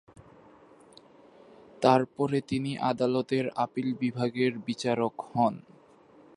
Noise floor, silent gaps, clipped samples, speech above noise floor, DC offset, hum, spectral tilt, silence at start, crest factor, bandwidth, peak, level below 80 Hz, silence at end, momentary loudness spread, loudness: -57 dBFS; none; under 0.1%; 29 dB; under 0.1%; none; -6.5 dB/octave; 1.8 s; 24 dB; 11 kHz; -6 dBFS; -70 dBFS; 0.8 s; 7 LU; -28 LUFS